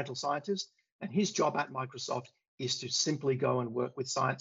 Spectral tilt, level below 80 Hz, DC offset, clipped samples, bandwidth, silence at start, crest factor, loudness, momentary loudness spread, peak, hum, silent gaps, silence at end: -4 dB/octave; -80 dBFS; under 0.1%; under 0.1%; 7.8 kHz; 0 s; 16 dB; -33 LUFS; 8 LU; -16 dBFS; none; 0.92-0.99 s, 2.48-2.58 s; 0 s